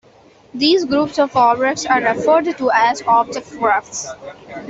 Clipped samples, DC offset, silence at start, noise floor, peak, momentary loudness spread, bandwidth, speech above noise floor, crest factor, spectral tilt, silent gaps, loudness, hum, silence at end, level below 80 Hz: under 0.1%; under 0.1%; 0.55 s; -48 dBFS; -2 dBFS; 13 LU; 8.2 kHz; 32 dB; 14 dB; -3 dB/octave; none; -16 LUFS; none; 0 s; -56 dBFS